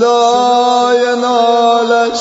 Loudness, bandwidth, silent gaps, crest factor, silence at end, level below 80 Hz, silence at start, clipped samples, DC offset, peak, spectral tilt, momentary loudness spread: -11 LUFS; 8 kHz; none; 10 dB; 0 s; -60 dBFS; 0 s; under 0.1%; under 0.1%; 0 dBFS; -2.5 dB/octave; 2 LU